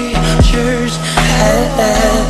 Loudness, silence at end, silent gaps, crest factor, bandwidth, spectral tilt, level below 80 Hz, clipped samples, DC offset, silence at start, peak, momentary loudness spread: -12 LUFS; 0 s; none; 12 dB; 13 kHz; -4.5 dB/octave; -18 dBFS; under 0.1%; under 0.1%; 0 s; 0 dBFS; 4 LU